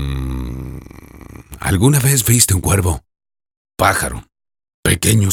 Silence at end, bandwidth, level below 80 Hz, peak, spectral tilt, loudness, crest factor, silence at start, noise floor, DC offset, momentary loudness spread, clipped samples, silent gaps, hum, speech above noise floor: 0 s; over 20 kHz; -32 dBFS; 0 dBFS; -4 dB/octave; -15 LUFS; 18 dB; 0 s; -37 dBFS; under 0.1%; 20 LU; under 0.1%; 3.57-3.65 s, 4.74-4.83 s; none; 23 dB